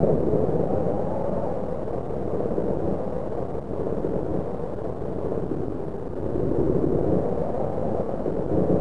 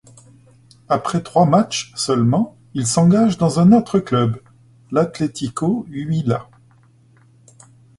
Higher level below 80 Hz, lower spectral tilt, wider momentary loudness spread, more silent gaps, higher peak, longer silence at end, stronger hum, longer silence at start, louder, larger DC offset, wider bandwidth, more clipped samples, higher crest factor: first, -40 dBFS vs -52 dBFS; first, -10.5 dB/octave vs -6.5 dB/octave; about the same, 8 LU vs 10 LU; neither; second, -6 dBFS vs -2 dBFS; second, 0 s vs 1.55 s; neither; second, 0 s vs 0.9 s; second, -27 LUFS vs -18 LUFS; first, 3% vs under 0.1%; about the same, 11 kHz vs 11.5 kHz; neither; about the same, 20 dB vs 18 dB